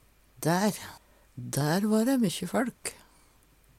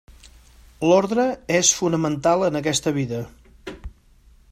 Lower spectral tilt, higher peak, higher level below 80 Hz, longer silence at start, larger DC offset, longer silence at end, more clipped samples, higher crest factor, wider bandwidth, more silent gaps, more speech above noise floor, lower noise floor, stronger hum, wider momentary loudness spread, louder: about the same, -5 dB/octave vs -4 dB/octave; second, -14 dBFS vs -2 dBFS; second, -64 dBFS vs -48 dBFS; first, 0.4 s vs 0.1 s; neither; first, 0.85 s vs 0.65 s; neither; about the same, 16 dB vs 20 dB; about the same, 16.5 kHz vs 15.5 kHz; neither; about the same, 33 dB vs 33 dB; first, -61 dBFS vs -53 dBFS; neither; second, 16 LU vs 21 LU; second, -28 LUFS vs -20 LUFS